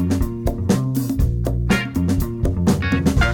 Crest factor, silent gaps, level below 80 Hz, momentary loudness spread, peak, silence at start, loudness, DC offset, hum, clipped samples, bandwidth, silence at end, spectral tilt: 14 dB; none; -26 dBFS; 4 LU; -6 dBFS; 0 s; -20 LUFS; under 0.1%; none; under 0.1%; 18 kHz; 0 s; -6.5 dB/octave